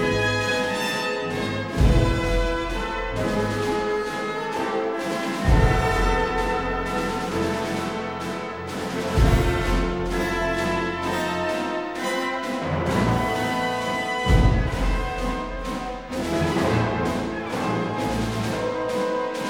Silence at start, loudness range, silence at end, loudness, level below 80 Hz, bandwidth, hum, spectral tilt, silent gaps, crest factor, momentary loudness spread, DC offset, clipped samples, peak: 0 s; 2 LU; 0 s; -24 LUFS; -30 dBFS; 17.5 kHz; none; -5.5 dB/octave; none; 18 dB; 7 LU; 0.1%; under 0.1%; -6 dBFS